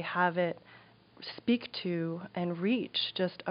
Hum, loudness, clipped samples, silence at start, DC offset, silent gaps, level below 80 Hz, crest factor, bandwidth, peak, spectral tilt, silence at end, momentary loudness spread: none; -32 LUFS; under 0.1%; 0 s; under 0.1%; none; -78 dBFS; 20 dB; 5.4 kHz; -14 dBFS; -3.5 dB/octave; 0 s; 9 LU